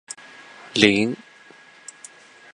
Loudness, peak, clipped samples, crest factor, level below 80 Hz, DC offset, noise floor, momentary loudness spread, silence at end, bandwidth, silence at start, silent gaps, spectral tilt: -19 LUFS; 0 dBFS; under 0.1%; 26 dB; -60 dBFS; under 0.1%; -49 dBFS; 26 LU; 1.4 s; 11.5 kHz; 0.75 s; none; -4 dB/octave